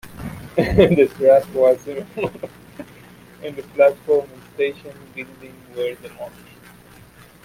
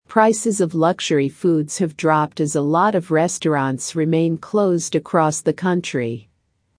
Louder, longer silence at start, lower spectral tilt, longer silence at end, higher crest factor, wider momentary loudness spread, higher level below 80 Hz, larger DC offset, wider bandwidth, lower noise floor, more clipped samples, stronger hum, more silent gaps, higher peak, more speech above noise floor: about the same, -18 LUFS vs -19 LUFS; about the same, 0.05 s vs 0.1 s; first, -7 dB/octave vs -5.5 dB/octave; first, 1.15 s vs 0.6 s; about the same, 18 dB vs 18 dB; first, 22 LU vs 5 LU; first, -42 dBFS vs -64 dBFS; neither; first, 16 kHz vs 10.5 kHz; second, -46 dBFS vs -66 dBFS; neither; neither; neither; about the same, -2 dBFS vs -2 dBFS; second, 27 dB vs 47 dB